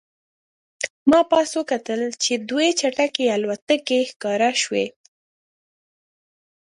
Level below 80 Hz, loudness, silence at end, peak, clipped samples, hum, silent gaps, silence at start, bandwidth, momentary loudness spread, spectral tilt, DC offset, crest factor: -66 dBFS; -21 LUFS; 1.75 s; -4 dBFS; under 0.1%; none; 0.90-1.06 s, 3.62-3.67 s, 4.16-4.20 s; 0.8 s; 11.5 kHz; 8 LU; -2.5 dB/octave; under 0.1%; 20 dB